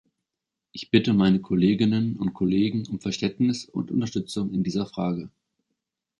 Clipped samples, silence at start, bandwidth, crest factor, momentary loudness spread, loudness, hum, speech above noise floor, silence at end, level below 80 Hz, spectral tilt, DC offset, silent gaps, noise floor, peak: under 0.1%; 0.75 s; 11.5 kHz; 20 dB; 9 LU; -25 LUFS; none; 62 dB; 0.9 s; -56 dBFS; -6.5 dB/octave; under 0.1%; none; -86 dBFS; -4 dBFS